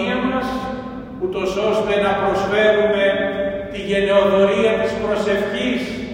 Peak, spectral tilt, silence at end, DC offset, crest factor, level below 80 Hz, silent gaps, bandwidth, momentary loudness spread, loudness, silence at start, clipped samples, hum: -2 dBFS; -5.5 dB/octave; 0 s; under 0.1%; 16 dB; -44 dBFS; none; 16 kHz; 10 LU; -18 LUFS; 0 s; under 0.1%; none